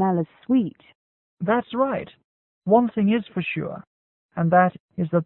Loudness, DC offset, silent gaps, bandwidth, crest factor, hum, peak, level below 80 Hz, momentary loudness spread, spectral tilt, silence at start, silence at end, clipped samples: -23 LUFS; under 0.1%; 0.95-1.37 s, 2.24-2.62 s, 3.87-4.29 s, 4.80-4.89 s; 4.1 kHz; 18 dB; none; -4 dBFS; -62 dBFS; 15 LU; -12 dB/octave; 0 s; 0 s; under 0.1%